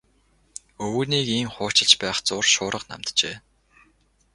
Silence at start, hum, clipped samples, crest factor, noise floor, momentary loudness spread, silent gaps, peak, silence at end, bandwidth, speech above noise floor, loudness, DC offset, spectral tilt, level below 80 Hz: 0.8 s; none; under 0.1%; 24 dB; -63 dBFS; 23 LU; none; 0 dBFS; 0.95 s; 11.5 kHz; 39 dB; -21 LUFS; under 0.1%; -2 dB/octave; -58 dBFS